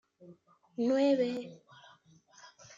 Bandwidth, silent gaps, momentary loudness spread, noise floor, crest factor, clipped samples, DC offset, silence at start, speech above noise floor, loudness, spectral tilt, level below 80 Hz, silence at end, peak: 7.6 kHz; none; 22 LU; -62 dBFS; 16 dB; under 0.1%; under 0.1%; 0.2 s; 31 dB; -31 LUFS; -5.5 dB/octave; -84 dBFS; 0.3 s; -18 dBFS